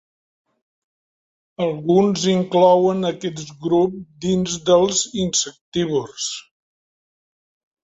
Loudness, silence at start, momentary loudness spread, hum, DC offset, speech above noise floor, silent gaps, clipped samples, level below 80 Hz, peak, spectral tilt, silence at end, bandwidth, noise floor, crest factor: -19 LUFS; 1.6 s; 12 LU; none; under 0.1%; over 71 dB; 5.61-5.72 s; under 0.1%; -56 dBFS; -2 dBFS; -4.5 dB/octave; 1.45 s; 8.2 kHz; under -90 dBFS; 18 dB